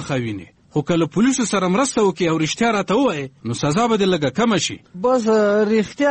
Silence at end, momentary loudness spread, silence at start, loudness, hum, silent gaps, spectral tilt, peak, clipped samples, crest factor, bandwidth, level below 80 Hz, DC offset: 0 s; 8 LU; 0 s; -19 LUFS; none; none; -5 dB/octave; -6 dBFS; under 0.1%; 12 dB; 8.8 kHz; -52 dBFS; under 0.1%